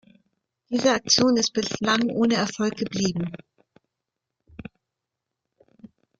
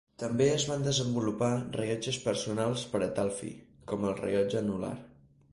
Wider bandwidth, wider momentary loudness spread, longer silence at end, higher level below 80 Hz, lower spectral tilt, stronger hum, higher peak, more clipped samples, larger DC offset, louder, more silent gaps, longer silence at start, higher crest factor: second, 7.8 kHz vs 11.5 kHz; first, 23 LU vs 11 LU; about the same, 0.35 s vs 0.45 s; about the same, -60 dBFS vs -60 dBFS; second, -3.5 dB/octave vs -5 dB/octave; neither; first, -6 dBFS vs -14 dBFS; neither; neither; first, -23 LUFS vs -31 LUFS; neither; first, 0.7 s vs 0.2 s; about the same, 22 dB vs 18 dB